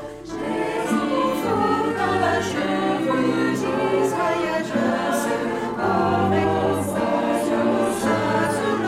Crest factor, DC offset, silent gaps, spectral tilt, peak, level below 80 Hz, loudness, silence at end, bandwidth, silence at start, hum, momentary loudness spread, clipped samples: 14 dB; under 0.1%; none; -5.5 dB/octave; -8 dBFS; -52 dBFS; -22 LUFS; 0 s; 16 kHz; 0 s; none; 4 LU; under 0.1%